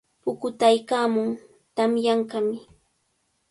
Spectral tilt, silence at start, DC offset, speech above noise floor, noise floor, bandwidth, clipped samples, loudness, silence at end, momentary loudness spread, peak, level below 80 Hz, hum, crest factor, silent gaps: -4.5 dB/octave; 0.25 s; under 0.1%; 49 dB; -71 dBFS; 11.5 kHz; under 0.1%; -24 LUFS; 0.9 s; 13 LU; -6 dBFS; -70 dBFS; none; 20 dB; none